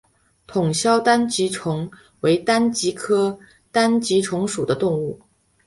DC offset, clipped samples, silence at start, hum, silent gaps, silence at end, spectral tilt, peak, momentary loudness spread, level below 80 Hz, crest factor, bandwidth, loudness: under 0.1%; under 0.1%; 0.5 s; none; none; 0.5 s; -4.5 dB/octave; -2 dBFS; 10 LU; -58 dBFS; 18 dB; 11.5 kHz; -20 LUFS